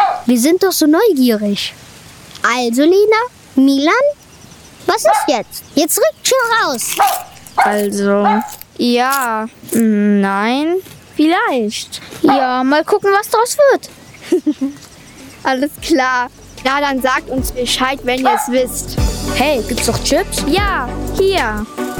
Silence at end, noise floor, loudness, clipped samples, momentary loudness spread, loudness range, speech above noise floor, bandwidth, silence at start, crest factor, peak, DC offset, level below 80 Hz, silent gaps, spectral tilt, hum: 0 s; -39 dBFS; -14 LUFS; under 0.1%; 9 LU; 2 LU; 26 dB; over 20 kHz; 0 s; 14 dB; -2 dBFS; under 0.1%; -32 dBFS; none; -4 dB/octave; none